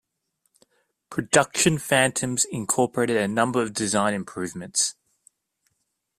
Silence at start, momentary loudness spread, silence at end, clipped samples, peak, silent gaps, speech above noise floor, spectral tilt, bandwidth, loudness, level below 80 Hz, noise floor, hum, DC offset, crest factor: 1.1 s; 9 LU; 1.25 s; under 0.1%; -2 dBFS; none; 53 dB; -3 dB/octave; 15.5 kHz; -23 LUFS; -60 dBFS; -76 dBFS; none; under 0.1%; 22 dB